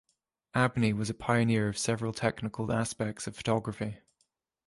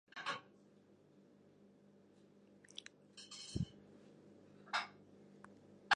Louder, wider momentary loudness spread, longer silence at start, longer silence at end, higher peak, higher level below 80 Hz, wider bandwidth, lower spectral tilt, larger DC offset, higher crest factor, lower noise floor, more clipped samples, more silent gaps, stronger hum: first, -31 LUFS vs -47 LUFS; second, 9 LU vs 25 LU; first, 0.55 s vs 0.15 s; first, 0.7 s vs 0 s; first, -12 dBFS vs -18 dBFS; first, -58 dBFS vs -68 dBFS; about the same, 11.5 kHz vs 11 kHz; first, -5.5 dB/octave vs -3.5 dB/octave; neither; second, 18 dB vs 32 dB; first, -77 dBFS vs -67 dBFS; neither; neither; second, none vs 50 Hz at -70 dBFS